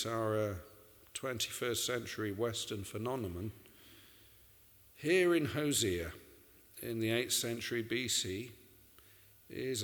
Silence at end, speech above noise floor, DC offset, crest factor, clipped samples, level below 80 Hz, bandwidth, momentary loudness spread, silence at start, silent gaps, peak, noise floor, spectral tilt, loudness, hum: 0 s; 27 dB; under 0.1%; 20 dB; under 0.1%; -64 dBFS; over 20 kHz; 18 LU; 0 s; none; -18 dBFS; -63 dBFS; -3.5 dB/octave; -36 LUFS; none